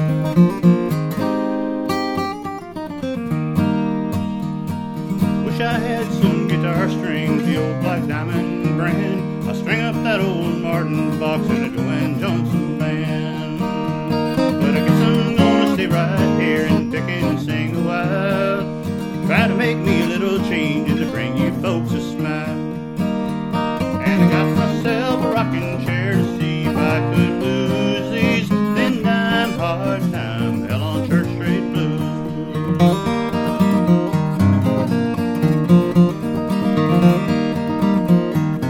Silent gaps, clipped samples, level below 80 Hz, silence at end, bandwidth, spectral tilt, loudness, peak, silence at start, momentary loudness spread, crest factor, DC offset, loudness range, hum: none; under 0.1%; -48 dBFS; 0 s; 16.5 kHz; -7.5 dB/octave; -19 LUFS; 0 dBFS; 0 s; 7 LU; 18 dB; under 0.1%; 4 LU; none